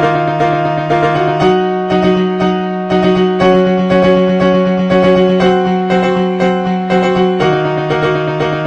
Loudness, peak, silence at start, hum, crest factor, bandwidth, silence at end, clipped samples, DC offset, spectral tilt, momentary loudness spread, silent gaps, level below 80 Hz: -12 LUFS; 0 dBFS; 0 s; none; 12 dB; 7.8 kHz; 0 s; under 0.1%; 0.1%; -7.5 dB/octave; 4 LU; none; -42 dBFS